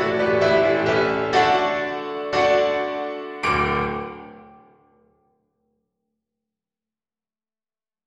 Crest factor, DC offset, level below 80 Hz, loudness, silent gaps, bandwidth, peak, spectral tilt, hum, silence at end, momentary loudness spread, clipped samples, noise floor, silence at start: 18 dB; under 0.1%; -48 dBFS; -21 LUFS; none; 11 kHz; -4 dBFS; -5.5 dB/octave; none; 3.65 s; 11 LU; under 0.1%; under -90 dBFS; 0 s